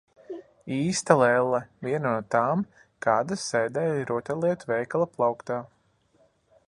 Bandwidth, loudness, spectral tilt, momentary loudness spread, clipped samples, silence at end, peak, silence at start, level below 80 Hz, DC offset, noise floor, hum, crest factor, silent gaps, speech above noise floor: 11.5 kHz; -26 LUFS; -5 dB/octave; 12 LU; under 0.1%; 1 s; -2 dBFS; 0.3 s; -68 dBFS; under 0.1%; -65 dBFS; none; 26 dB; none; 40 dB